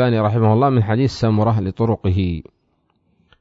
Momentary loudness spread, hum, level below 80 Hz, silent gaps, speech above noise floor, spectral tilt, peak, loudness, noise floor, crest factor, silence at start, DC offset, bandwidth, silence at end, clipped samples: 6 LU; none; -42 dBFS; none; 48 dB; -8.5 dB/octave; -4 dBFS; -18 LUFS; -65 dBFS; 14 dB; 0 s; under 0.1%; 7.6 kHz; 1 s; under 0.1%